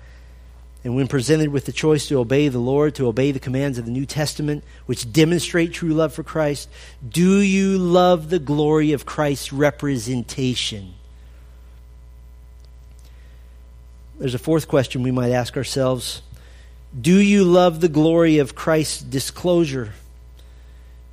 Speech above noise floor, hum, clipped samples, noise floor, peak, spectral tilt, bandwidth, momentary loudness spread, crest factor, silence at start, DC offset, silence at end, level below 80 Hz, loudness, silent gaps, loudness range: 24 dB; none; under 0.1%; -42 dBFS; -2 dBFS; -6 dB/octave; 15.5 kHz; 11 LU; 18 dB; 0 s; under 0.1%; 0 s; -42 dBFS; -19 LUFS; none; 8 LU